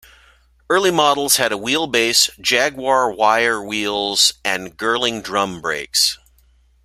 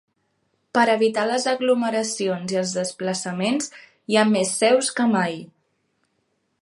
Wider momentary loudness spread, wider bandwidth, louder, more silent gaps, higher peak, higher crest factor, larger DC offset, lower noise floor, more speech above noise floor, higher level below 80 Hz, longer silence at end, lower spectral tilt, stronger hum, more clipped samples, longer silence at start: about the same, 7 LU vs 8 LU; first, 16 kHz vs 11.5 kHz; first, -17 LUFS vs -21 LUFS; neither; first, 0 dBFS vs -4 dBFS; about the same, 18 dB vs 18 dB; neither; second, -55 dBFS vs -71 dBFS; second, 37 dB vs 50 dB; first, -54 dBFS vs -72 dBFS; second, 0.7 s vs 1.15 s; second, -1.5 dB/octave vs -4 dB/octave; neither; neither; about the same, 0.7 s vs 0.75 s